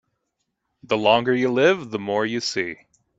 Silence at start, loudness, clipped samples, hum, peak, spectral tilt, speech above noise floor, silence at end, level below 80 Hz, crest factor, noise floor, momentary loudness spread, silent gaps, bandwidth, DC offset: 0.9 s; -21 LUFS; under 0.1%; none; -2 dBFS; -4.5 dB/octave; 56 dB; 0.45 s; -64 dBFS; 20 dB; -77 dBFS; 9 LU; none; 8 kHz; under 0.1%